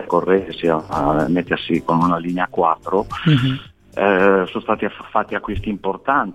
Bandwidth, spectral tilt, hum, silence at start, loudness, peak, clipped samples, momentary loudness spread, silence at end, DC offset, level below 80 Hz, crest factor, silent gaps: 12 kHz; -7.5 dB/octave; none; 0 s; -19 LUFS; -2 dBFS; under 0.1%; 8 LU; 0 s; 0.1%; -42 dBFS; 16 dB; none